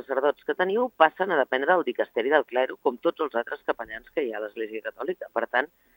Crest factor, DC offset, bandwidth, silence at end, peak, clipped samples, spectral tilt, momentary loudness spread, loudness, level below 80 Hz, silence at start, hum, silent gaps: 24 dB; under 0.1%; 16.5 kHz; 0.3 s; -2 dBFS; under 0.1%; -6.5 dB/octave; 11 LU; -26 LUFS; -70 dBFS; 0.1 s; none; none